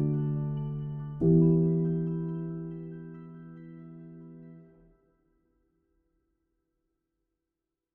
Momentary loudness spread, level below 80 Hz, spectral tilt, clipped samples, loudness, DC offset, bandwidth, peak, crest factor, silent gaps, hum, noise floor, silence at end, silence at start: 24 LU; -56 dBFS; -13.5 dB/octave; under 0.1%; -29 LUFS; under 0.1%; 2.1 kHz; -12 dBFS; 20 dB; none; none; -87 dBFS; 3.3 s; 0 s